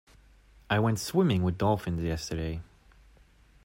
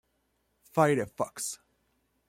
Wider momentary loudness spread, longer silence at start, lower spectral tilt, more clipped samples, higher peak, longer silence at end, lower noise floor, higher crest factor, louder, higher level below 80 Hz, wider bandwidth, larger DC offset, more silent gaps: about the same, 9 LU vs 11 LU; about the same, 0.7 s vs 0.75 s; about the same, -6 dB/octave vs -5 dB/octave; neither; about the same, -12 dBFS vs -10 dBFS; first, 1.05 s vs 0.75 s; second, -59 dBFS vs -75 dBFS; about the same, 18 dB vs 22 dB; about the same, -29 LUFS vs -30 LUFS; first, -50 dBFS vs -68 dBFS; about the same, 16 kHz vs 16.5 kHz; neither; neither